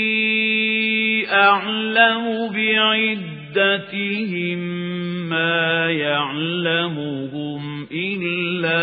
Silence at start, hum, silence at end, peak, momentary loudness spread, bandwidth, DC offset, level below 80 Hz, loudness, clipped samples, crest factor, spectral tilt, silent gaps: 0 s; none; 0 s; 0 dBFS; 11 LU; 4.9 kHz; under 0.1%; -70 dBFS; -19 LUFS; under 0.1%; 20 dB; -10 dB/octave; none